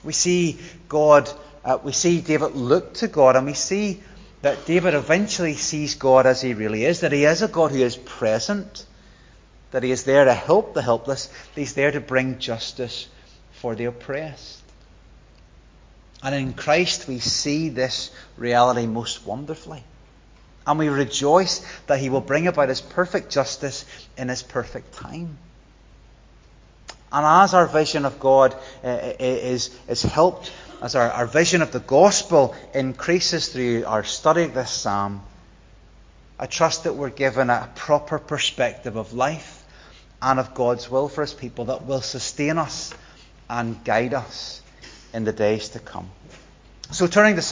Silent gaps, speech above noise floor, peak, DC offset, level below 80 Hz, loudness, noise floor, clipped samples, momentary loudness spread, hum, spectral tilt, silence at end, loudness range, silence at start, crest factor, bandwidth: none; 29 dB; 0 dBFS; under 0.1%; -50 dBFS; -21 LUFS; -50 dBFS; under 0.1%; 17 LU; none; -4 dB/octave; 0 s; 7 LU; 0.05 s; 22 dB; 7.6 kHz